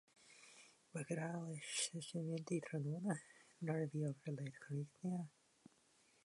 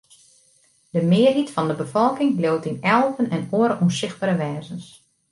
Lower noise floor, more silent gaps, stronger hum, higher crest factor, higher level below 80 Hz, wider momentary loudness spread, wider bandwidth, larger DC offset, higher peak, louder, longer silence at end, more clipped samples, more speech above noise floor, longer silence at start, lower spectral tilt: first, -74 dBFS vs -59 dBFS; neither; neither; about the same, 18 dB vs 18 dB; second, -90 dBFS vs -64 dBFS; first, 19 LU vs 10 LU; about the same, 11.5 kHz vs 11.5 kHz; neither; second, -28 dBFS vs -4 dBFS; second, -45 LUFS vs -21 LUFS; first, 0.95 s vs 0.45 s; neither; second, 30 dB vs 39 dB; second, 0.2 s vs 0.95 s; second, -5 dB/octave vs -6.5 dB/octave